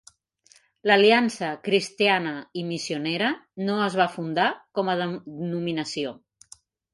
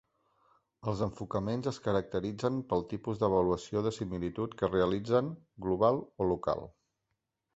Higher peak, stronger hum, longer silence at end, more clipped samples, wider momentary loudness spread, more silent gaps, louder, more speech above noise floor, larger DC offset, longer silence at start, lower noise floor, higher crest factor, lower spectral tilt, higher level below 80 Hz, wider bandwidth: first, -6 dBFS vs -12 dBFS; neither; about the same, 0.8 s vs 0.85 s; neither; first, 13 LU vs 9 LU; neither; first, -24 LUFS vs -33 LUFS; second, 35 dB vs 52 dB; neither; about the same, 0.85 s vs 0.85 s; second, -60 dBFS vs -84 dBFS; about the same, 20 dB vs 20 dB; second, -4.5 dB/octave vs -7.5 dB/octave; second, -72 dBFS vs -56 dBFS; first, 11.5 kHz vs 8.2 kHz